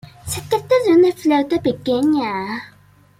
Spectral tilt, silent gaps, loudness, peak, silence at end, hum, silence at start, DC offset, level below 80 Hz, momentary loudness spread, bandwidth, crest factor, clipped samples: -5 dB/octave; none; -18 LUFS; -4 dBFS; 0.5 s; none; 0.25 s; under 0.1%; -52 dBFS; 13 LU; 16 kHz; 14 dB; under 0.1%